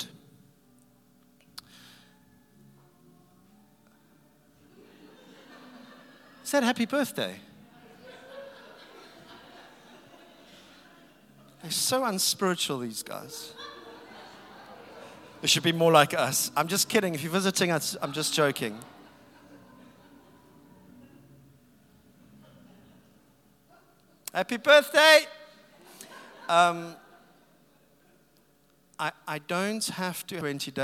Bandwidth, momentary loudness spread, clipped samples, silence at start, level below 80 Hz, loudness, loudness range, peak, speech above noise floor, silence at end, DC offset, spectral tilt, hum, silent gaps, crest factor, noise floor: 18 kHz; 28 LU; under 0.1%; 0 s; -76 dBFS; -25 LUFS; 13 LU; -2 dBFS; 39 dB; 0 s; under 0.1%; -3 dB/octave; none; none; 28 dB; -64 dBFS